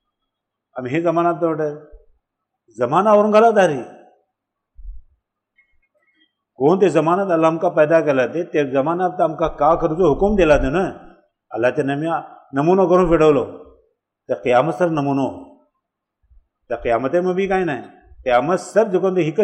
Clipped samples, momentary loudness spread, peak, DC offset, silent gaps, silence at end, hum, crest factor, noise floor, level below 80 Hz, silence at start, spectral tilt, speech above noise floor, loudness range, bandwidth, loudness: under 0.1%; 12 LU; -4 dBFS; under 0.1%; none; 0 s; none; 16 dB; -79 dBFS; -40 dBFS; 0.75 s; -7 dB/octave; 62 dB; 5 LU; 10.5 kHz; -17 LUFS